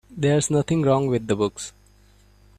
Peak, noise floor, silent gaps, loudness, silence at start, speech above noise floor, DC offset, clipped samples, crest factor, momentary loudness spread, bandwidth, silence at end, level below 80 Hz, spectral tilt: -6 dBFS; -54 dBFS; none; -22 LUFS; 0.1 s; 33 dB; under 0.1%; under 0.1%; 16 dB; 10 LU; 13.5 kHz; 0.9 s; -52 dBFS; -6 dB/octave